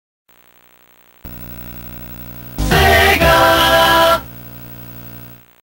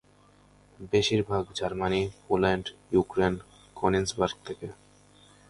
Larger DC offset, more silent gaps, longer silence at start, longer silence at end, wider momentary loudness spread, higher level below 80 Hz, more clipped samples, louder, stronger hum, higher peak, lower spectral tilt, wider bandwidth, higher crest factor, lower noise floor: neither; neither; first, 1.25 s vs 0.8 s; second, 0.35 s vs 0.75 s; first, 22 LU vs 14 LU; first, -28 dBFS vs -50 dBFS; neither; first, -11 LUFS vs -28 LUFS; about the same, 60 Hz at -40 dBFS vs 50 Hz at -50 dBFS; first, 0 dBFS vs -10 dBFS; about the same, -4 dB/octave vs -5 dB/octave; first, 16.5 kHz vs 11.5 kHz; about the same, 16 dB vs 20 dB; second, -49 dBFS vs -59 dBFS